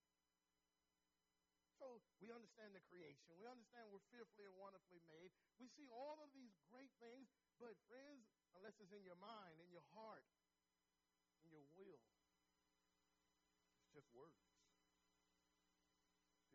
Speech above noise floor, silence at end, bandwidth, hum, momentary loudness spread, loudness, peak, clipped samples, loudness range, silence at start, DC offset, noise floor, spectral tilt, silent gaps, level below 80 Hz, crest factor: over 25 dB; 0 s; 7.4 kHz; none; 7 LU; -65 LUFS; -46 dBFS; under 0.1%; 3 LU; 1.75 s; under 0.1%; under -90 dBFS; -3.5 dB/octave; none; under -90 dBFS; 20 dB